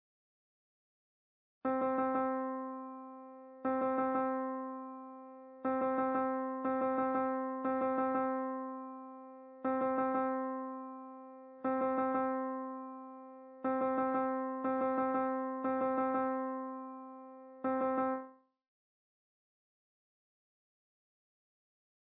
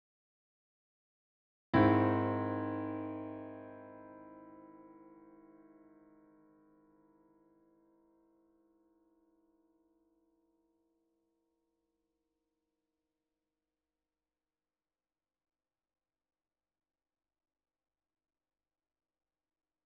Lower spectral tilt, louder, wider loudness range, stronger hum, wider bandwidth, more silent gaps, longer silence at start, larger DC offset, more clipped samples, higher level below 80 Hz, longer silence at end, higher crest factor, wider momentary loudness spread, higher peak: about the same, -6 dB/octave vs -7 dB/octave; second, -36 LUFS vs -33 LUFS; second, 5 LU vs 23 LU; neither; second, 4 kHz vs 4.9 kHz; neither; about the same, 1.65 s vs 1.75 s; neither; neither; second, -80 dBFS vs -70 dBFS; second, 3.85 s vs 14.95 s; second, 14 dB vs 28 dB; second, 17 LU vs 28 LU; second, -22 dBFS vs -16 dBFS